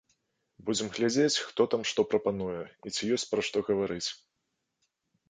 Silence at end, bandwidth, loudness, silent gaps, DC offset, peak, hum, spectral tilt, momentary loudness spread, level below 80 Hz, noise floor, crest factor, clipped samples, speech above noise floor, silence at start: 1.15 s; 9.6 kHz; -30 LUFS; none; under 0.1%; -12 dBFS; none; -3.5 dB/octave; 10 LU; -66 dBFS; -82 dBFS; 20 dB; under 0.1%; 52 dB; 0.6 s